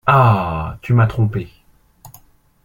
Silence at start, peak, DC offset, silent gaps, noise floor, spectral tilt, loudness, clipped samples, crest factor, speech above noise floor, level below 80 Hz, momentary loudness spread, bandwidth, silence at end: 0.05 s; -2 dBFS; under 0.1%; none; -48 dBFS; -8.5 dB/octave; -17 LUFS; under 0.1%; 16 dB; 33 dB; -40 dBFS; 14 LU; 15.5 kHz; 0.55 s